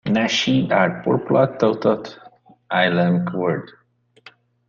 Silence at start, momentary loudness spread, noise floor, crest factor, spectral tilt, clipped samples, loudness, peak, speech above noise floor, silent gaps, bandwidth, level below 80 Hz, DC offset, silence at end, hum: 0.05 s; 7 LU; -50 dBFS; 18 dB; -6 dB/octave; under 0.1%; -19 LUFS; -4 dBFS; 31 dB; none; 7.4 kHz; -60 dBFS; under 0.1%; 1 s; none